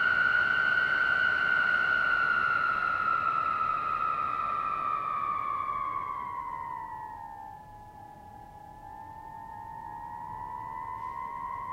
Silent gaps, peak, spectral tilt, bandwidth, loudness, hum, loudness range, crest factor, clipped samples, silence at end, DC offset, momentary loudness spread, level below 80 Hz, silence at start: none; -16 dBFS; -4 dB/octave; 12.5 kHz; -28 LUFS; none; 18 LU; 14 dB; under 0.1%; 0 s; under 0.1%; 21 LU; -60 dBFS; 0 s